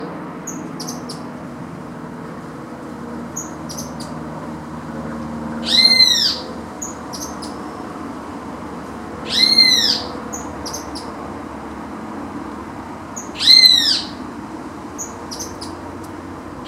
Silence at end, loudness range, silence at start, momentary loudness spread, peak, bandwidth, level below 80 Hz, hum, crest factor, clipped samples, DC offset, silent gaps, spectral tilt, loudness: 0 s; 15 LU; 0 s; 22 LU; 0 dBFS; 16 kHz; -48 dBFS; none; 20 dB; under 0.1%; under 0.1%; none; -2 dB/octave; -13 LUFS